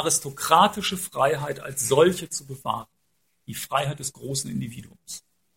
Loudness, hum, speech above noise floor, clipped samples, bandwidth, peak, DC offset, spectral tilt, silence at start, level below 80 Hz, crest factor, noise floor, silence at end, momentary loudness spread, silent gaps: -24 LUFS; none; 48 dB; under 0.1%; 16.5 kHz; -2 dBFS; under 0.1%; -3.5 dB/octave; 0 s; -60 dBFS; 22 dB; -73 dBFS; 0.35 s; 19 LU; none